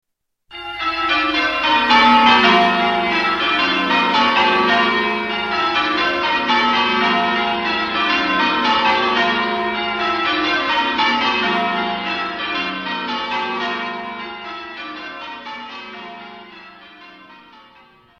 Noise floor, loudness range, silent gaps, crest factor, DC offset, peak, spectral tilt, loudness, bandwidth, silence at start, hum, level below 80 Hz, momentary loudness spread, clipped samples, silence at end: -53 dBFS; 14 LU; none; 18 dB; under 0.1%; 0 dBFS; -4 dB/octave; -16 LUFS; 12 kHz; 0.5 s; none; -50 dBFS; 17 LU; under 0.1%; 0.8 s